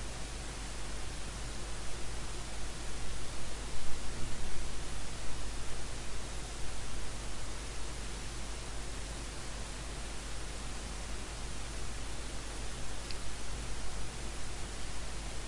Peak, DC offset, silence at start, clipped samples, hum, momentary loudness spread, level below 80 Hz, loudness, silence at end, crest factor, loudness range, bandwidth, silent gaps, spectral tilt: -16 dBFS; under 0.1%; 0 s; under 0.1%; none; 1 LU; -44 dBFS; -43 LUFS; 0 s; 16 dB; 0 LU; 11.5 kHz; none; -3 dB/octave